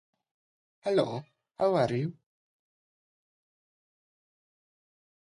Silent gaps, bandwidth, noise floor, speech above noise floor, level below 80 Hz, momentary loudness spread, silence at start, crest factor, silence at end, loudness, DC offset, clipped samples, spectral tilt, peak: none; 11.5 kHz; under -90 dBFS; over 62 dB; -72 dBFS; 11 LU; 0.85 s; 20 dB; 3.15 s; -30 LUFS; under 0.1%; under 0.1%; -7 dB/octave; -14 dBFS